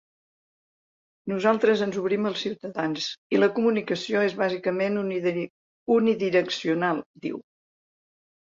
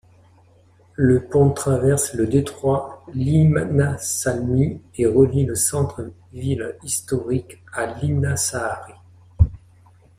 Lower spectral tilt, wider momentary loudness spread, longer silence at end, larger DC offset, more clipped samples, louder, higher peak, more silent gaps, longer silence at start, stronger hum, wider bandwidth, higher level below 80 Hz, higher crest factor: about the same, -5.5 dB/octave vs -6 dB/octave; about the same, 12 LU vs 11 LU; first, 1.05 s vs 0.6 s; neither; neither; second, -25 LUFS vs -20 LUFS; second, -8 dBFS vs -2 dBFS; first, 3.18-3.30 s, 5.50-5.86 s, 7.06-7.14 s vs none; first, 1.25 s vs 1 s; neither; second, 7.6 kHz vs 15.5 kHz; second, -70 dBFS vs -38 dBFS; about the same, 18 dB vs 18 dB